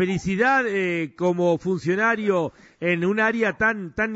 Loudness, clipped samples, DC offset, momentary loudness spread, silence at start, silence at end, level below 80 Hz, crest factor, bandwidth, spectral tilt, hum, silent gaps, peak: -22 LUFS; under 0.1%; under 0.1%; 6 LU; 0 s; 0 s; -54 dBFS; 14 dB; 8 kHz; -6.5 dB/octave; none; none; -8 dBFS